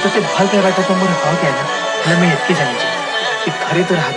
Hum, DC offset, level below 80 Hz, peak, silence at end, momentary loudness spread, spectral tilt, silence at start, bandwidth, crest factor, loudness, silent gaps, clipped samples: none; under 0.1%; -58 dBFS; 0 dBFS; 0 s; 5 LU; -4.5 dB/octave; 0 s; 11 kHz; 14 dB; -15 LUFS; none; under 0.1%